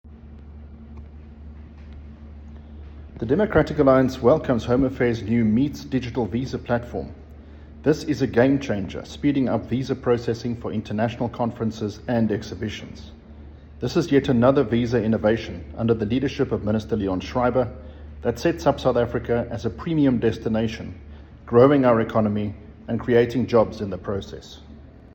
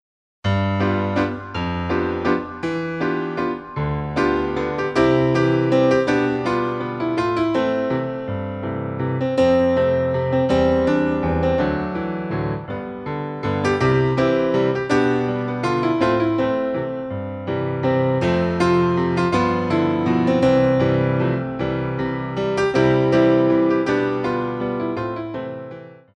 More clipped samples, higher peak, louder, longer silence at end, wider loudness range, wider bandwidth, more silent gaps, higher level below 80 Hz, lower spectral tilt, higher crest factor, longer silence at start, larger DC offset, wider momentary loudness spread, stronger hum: neither; about the same, -2 dBFS vs -4 dBFS; about the same, -22 LUFS vs -20 LUFS; about the same, 0.15 s vs 0.2 s; about the same, 5 LU vs 4 LU; first, 17 kHz vs 9.4 kHz; neither; about the same, -44 dBFS vs -42 dBFS; about the same, -7.5 dB/octave vs -7.5 dB/octave; about the same, 20 dB vs 16 dB; second, 0.05 s vs 0.45 s; neither; first, 24 LU vs 10 LU; neither